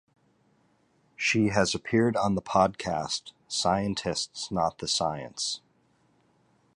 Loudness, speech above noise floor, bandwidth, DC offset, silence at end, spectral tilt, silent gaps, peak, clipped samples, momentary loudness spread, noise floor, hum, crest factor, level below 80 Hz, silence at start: -28 LUFS; 40 dB; 11.5 kHz; under 0.1%; 1.15 s; -4 dB/octave; none; -8 dBFS; under 0.1%; 7 LU; -67 dBFS; none; 22 dB; -56 dBFS; 1.2 s